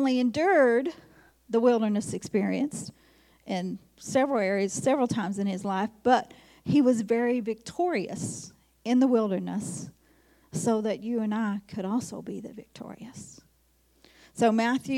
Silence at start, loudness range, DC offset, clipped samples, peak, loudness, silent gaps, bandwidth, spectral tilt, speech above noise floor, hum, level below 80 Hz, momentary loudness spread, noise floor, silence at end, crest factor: 0 s; 5 LU; under 0.1%; under 0.1%; -8 dBFS; -27 LUFS; none; 14 kHz; -5.5 dB/octave; 39 dB; none; -66 dBFS; 19 LU; -66 dBFS; 0 s; 18 dB